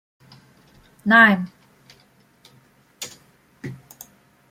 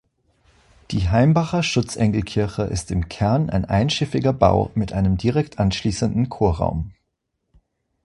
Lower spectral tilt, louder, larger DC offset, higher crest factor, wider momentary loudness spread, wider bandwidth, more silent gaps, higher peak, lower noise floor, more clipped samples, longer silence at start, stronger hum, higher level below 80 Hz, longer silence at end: second, -4.5 dB/octave vs -6.5 dB/octave; first, -15 LUFS vs -21 LUFS; neither; about the same, 22 dB vs 20 dB; first, 25 LU vs 7 LU; first, 16.5 kHz vs 11.5 kHz; neither; about the same, -2 dBFS vs 0 dBFS; second, -57 dBFS vs -75 dBFS; neither; first, 1.05 s vs 0.9 s; neither; second, -66 dBFS vs -36 dBFS; second, 0.75 s vs 1.15 s